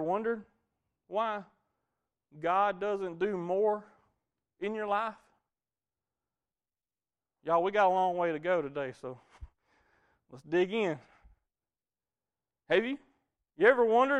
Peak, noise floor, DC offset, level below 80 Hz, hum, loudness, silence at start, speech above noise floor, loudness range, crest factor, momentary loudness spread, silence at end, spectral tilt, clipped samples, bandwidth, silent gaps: -10 dBFS; under -90 dBFS; under 0.1%; -66 dBFS; none; -31 LUFS; 0 s; over 60 dB; 5 LU; 22 dB; 14 LU; 0 s; -6.5 dB/octave; under 0.1%; 9.2 kHz; none